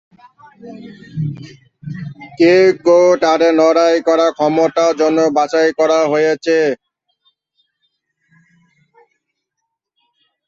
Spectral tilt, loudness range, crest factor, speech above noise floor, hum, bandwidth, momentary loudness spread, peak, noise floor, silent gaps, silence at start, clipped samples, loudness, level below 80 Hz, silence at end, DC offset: -5.5 dB/octave; 8 LU; 14 dB; 63 dB; none; 7.8 kHz; 20 LU; -2 dBFS; -76 dBFS; none; 0.65 s; under 0.1%; -13 LUFS; -60 dBFS; 3.7 s; under 0.1%